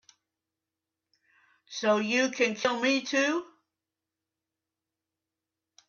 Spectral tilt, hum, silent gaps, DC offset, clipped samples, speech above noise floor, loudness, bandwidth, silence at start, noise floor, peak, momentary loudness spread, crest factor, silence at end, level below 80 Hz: -3 dB/octave; none; none; under 0.1%; under 0.1%; 61 dB; -27 LUFS; 7.4 kHz; 1.7 s; -88 dBFS; -12 dBFS; 6 LU; 20 dB; 2.45 s; -80 dBFS